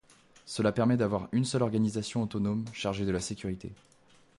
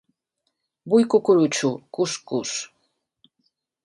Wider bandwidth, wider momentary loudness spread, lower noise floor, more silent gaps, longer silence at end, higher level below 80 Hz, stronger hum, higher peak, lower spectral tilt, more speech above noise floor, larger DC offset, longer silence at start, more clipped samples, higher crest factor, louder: about the same, 11.5 kHz vs 11.5 kHz; about the same, 11 LU vs 11 LU; second, -56 dBFS vs -77 dBFS; neither; second, 0.65 s vs 1.2 s; first, -56 dBFS vs -72 dBFS; neither; second, -14 dBFS vs -6 dBFS; first, -6 dB/octave vs -4.5 dB/octave; second, 27 dB vs 56 dB; neither; second, 0.45 s vs 0.85 s; neither; about the same, 16 dB vs 18 dB; second, -31 LUFS vs -22 LUFS